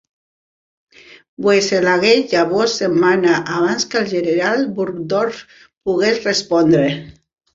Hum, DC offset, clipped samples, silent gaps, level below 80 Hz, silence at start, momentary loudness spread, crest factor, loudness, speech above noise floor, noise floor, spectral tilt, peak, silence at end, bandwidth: none; under 0.1%; under 0.1%; 5.77-5.81 s; -56 dBFS; 1.4 s; 8 LU; 16 dB; -16 LUFS; over 74 dB; under -90 dBFS; -4.5 dB/octave; 0 dBFS; 0.45 s; 7.8 kHz